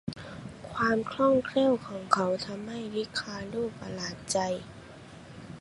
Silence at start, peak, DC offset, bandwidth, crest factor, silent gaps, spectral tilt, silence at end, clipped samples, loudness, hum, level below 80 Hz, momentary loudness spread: 0.05 s; -6 dBFS; under 0.1%; 11.5 kHz; 26 dB; none; -4.5 dB/octave; 0 s; under 0.1%; -30 LUFS; none; -60 dBFS; 21 LU